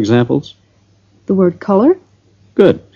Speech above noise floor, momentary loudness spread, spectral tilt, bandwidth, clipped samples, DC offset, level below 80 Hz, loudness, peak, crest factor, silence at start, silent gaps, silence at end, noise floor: 40 dB; 9 LU; -8 dB/octave; 7.2 kHz; 0.2%; under 0.1%; -52 dBFS; -14 LUFS; 0 dBFS; 14 dB; 0 s; none; 0.15 s; -52 dBFS